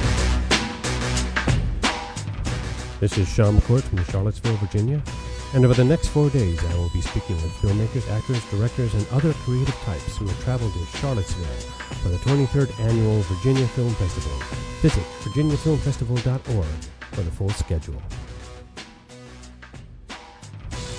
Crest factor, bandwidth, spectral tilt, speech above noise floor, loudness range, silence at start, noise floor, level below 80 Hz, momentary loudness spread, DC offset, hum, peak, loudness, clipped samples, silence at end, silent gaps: 20 dB; 11 kHz; -6 dB/octave; 21 dB; 7 LU; 0 s; -43 dBFS; -32 dBFS; 19 LU; under 0.1%; none; -2 dBFS; -23 LUFS; under 0.1%; 0 s; none